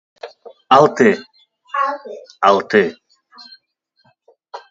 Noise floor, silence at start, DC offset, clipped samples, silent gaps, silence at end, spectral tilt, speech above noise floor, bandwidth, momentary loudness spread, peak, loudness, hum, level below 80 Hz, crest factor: -63 dBFS; 0.25 s; under 0.1%; under 0.1%; none; 0.15 s; -5.5 dB/octave; 49 dB; 7.8 kHz; 25 LU; 0 dBFS; -15 LUFS; none; -62 dBFS; 18 dB